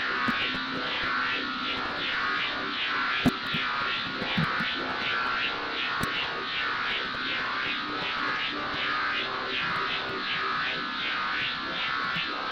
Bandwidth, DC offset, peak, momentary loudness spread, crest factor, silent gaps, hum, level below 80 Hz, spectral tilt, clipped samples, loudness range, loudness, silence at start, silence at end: 16 kHz; under 0.1%; -10 dBFS; 3 LU; 18 dB; none; none; -56 dBFS; -4 dB/octave; under 0.1%; 1 LU; -28 LUFS; 0 s; 0 s